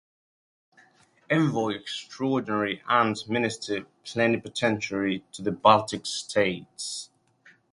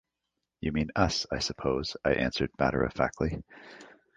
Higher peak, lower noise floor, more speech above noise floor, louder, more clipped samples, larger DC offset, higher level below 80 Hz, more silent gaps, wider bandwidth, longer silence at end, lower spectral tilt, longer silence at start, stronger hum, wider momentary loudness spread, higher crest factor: first, -2 dBFS vs -8 dBFS; second, -60 dBFS vs -85 dBFS; second, 34 dB vs 55 dB; first, -26 LUFS vs -30 LUFS; neither; neither; second, -64 dBFS vs -46 dBFS; neither; first, 11.5 kHz vs 9.6 kHz; first, 0.7 s vs 0.3 s; about the same, -4.5 dB/octave vs -5 dB/octave; first, 1.3 s vs 0.6 s; neither; about the same, 11 LU vs 12 LU; about the same, 24 dB vs 22 dB